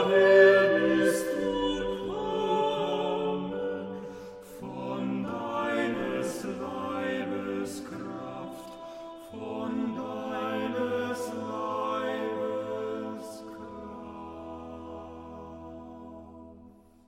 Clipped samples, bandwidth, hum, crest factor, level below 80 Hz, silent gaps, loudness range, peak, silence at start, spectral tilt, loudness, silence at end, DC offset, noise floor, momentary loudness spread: under 0.1%; 16 kHz; none; 22 dB; -60 dBFS; none; 11 LU; -8 dBFS; 0 s; -5 dB/octave; -29 LUFS; 0.35 s; under 0.1%; -54 dBFS; 19 LU